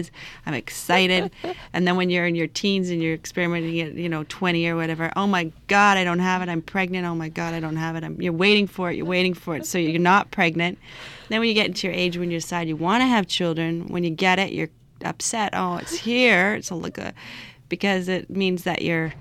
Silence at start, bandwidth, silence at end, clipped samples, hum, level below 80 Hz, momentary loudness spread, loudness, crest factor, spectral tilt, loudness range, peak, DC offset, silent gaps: 0 s; 15 kHz; 0 s; under 0.1%; none; -54 dBFS; 12 LU; -22 LUFS; 18 dB; -4.5 dB/octave; 2 LU; -6 dBFS; under 0.1%; none